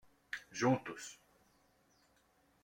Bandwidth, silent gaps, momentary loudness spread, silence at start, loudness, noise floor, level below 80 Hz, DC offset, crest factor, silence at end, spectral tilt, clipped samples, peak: 16.5 kHz; none; 15 LU; 0.35 s; -38 LUFS; -73 dBFS; -78 dBFS; under 0.1%; 22 dB; 1.5 s; -5 dB/octave; under 0.1%; -20 dBFS